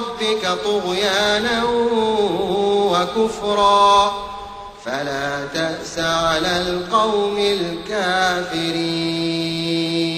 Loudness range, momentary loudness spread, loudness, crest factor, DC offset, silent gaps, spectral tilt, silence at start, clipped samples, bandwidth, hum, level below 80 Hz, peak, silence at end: 3 LU; 8 LU; -19 LUFS; 16 dB; under 0.1%; none; -4 dB/octave; 0 s; under 0.1%; 15 kHz; none; -46 dBFS; -4 dBFS; 0 s